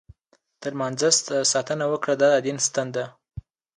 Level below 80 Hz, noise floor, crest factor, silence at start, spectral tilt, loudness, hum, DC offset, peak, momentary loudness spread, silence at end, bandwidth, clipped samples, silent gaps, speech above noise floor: -56 dBFS; -66 dBFS; 18 dB; 0.6 s; -2.5 dB/octave; -22 LUFS; none; under 0.1%; -6 dBFS; 16 LU; 0.35 s; 11.5 kHz; under 0.1%; none; 43 dB